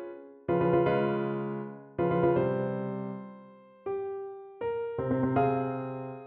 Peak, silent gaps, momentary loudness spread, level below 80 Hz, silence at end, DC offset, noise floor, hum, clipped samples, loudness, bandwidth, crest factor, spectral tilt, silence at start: -14 dBFS; none; 14 LU; -60 dBFS; 0 s; under 0.1%; -53 dBFS; none; under 0.1%; -30 LUFS; 4.3 kHz; 16 dB; -11.5 dB/octave; 0 s